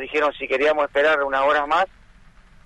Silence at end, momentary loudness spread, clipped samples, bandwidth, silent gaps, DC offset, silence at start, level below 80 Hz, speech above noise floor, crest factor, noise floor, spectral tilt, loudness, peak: 0.8 s; 4 LU; under 0.1%; 9.6 kHz; none; under 0.1%; 0 s; -50 dBFS; 29 dB; 14 dB; -49 dBFS; -3.5 dB/octave; -20 LUFS; -8 dBFS